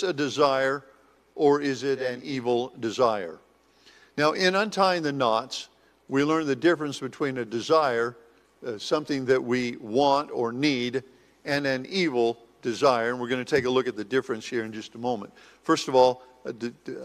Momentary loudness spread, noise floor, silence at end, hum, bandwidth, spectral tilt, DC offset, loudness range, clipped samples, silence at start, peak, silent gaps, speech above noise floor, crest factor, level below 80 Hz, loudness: 13 LU; -58 dBFS; 0 s; none; 14 kHz; -5 dB/octave; under 0.1%; 2 LU; under 0.1%; 0 s; -6 dBFS; none; 33 dB; 20 dB; -68 dBFS; -26 LUFS